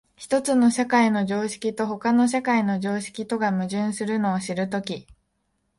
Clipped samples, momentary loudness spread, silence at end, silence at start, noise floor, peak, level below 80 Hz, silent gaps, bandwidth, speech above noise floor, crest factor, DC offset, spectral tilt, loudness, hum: under 0.1%; 8 LU; 0.75 s; 0.2 s; -73 dBFS; -8 dBFS; -64 dBFS; none; 11.5 kHz; 50 dB; 16 dB; under 0.1%; -5.5 dB/octave; -23 LUFS; none